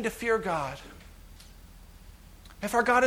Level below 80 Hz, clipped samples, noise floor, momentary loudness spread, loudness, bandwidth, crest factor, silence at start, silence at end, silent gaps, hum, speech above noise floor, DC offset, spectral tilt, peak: -52 dBFS; under 0.1%; -50 dBFS; 25 LU; -29 LUFS; 20 kHz; 20 dB; 0 s; 0 s; none; none; 23 dB; under 0.1%; -4.5 dB/octave; -10 dBFS